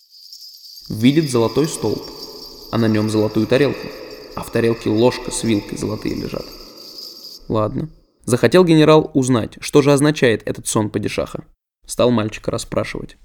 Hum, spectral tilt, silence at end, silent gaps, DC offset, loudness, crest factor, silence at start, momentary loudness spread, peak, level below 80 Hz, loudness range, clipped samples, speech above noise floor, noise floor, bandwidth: none; -5.5 dB/octave; 0.15 s; none; under 0.1%; -18 LUFS; 18 dB; 0.3 s; 20 LU; 0 dBFS; -44 dBFS; 6 LU; under 0.1%; 23 dB; -40 dBFS; 19 kHz